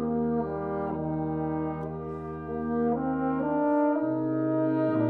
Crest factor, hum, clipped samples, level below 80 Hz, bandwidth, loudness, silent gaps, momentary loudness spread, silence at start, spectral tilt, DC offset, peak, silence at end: 12 dB; none; under 0.1%; -52 dBFS; 4.3 kHz; -29 LUFS; none; 9 LU; 0 s; -11.5 dB/octave; under 0.1%; -16 dBFS; 0 s